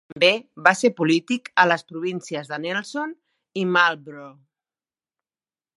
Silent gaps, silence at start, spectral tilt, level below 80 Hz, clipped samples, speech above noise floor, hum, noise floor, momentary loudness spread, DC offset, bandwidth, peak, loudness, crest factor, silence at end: none; 0.15 s; -4 dB/octave; -72 dBFS; under 0.1%; over 68 dB; none; under -90 dBFS; 15 LU; under 0.1%; 11.5 kHz; 0 dBFS; -21 LUFS; 24 dB; 1.5 s